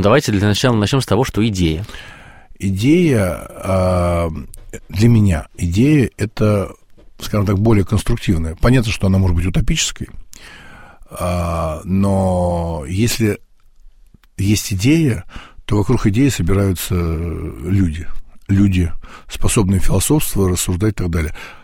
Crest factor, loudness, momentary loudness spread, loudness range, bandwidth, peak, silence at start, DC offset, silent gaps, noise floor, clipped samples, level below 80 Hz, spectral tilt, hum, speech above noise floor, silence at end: 16 dB; -17 LUFS; 13 LU; 3 LU; 16.5 kHz; -2 dBFS; 0 s; 0.2%; none; -46 dBFS; under 0.1%; -28 dBFS; -6 dB/octave; none; 31 dB; 0.05 s